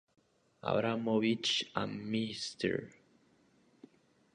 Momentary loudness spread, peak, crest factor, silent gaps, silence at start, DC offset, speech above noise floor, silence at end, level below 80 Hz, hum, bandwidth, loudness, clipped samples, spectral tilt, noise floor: 9 LU; -16 dBFS; 20 dB; none; 0.65 s; under 0.1%; 35 dB; 1.45 s; -72 dBFS; none; 10 kHz; -34 LUFS; under 0.1%; -4.5 dB/octave; -69 dBFS